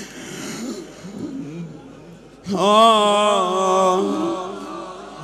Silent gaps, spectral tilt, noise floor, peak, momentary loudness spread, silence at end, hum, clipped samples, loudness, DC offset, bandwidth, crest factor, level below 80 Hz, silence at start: none; -4 dB/octave; -42 dBFS; -2 dBFS; 21 LU; 0 s; none; under 0.1%; -17 LUFS; under 0.1%; 15 kHz; 18 dB; -58 dBFS; 0 s